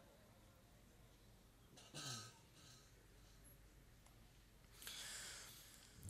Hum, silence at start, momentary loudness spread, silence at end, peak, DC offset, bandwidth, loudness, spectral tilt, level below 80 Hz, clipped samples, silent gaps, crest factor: none; 0 s; 18 LU; 0 s; -30 dBFS; under 0.1%; 16 kHz; -55 LUFS; -2 dB/octave; -72 dBFS; under 0.1%; none; 30 dB